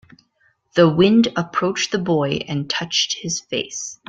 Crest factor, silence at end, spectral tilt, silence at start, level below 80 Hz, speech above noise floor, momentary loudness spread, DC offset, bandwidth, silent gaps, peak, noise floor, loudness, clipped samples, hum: 18 dB; 0.15 s; -4.5 dB/octave; 0.75 s; -56 dBFS; 44 dB; 10 LU; under 0.1%; 9 kHz; none; -2 dBFS; -63 dBFS; -19 LUFS; under 0.1%; none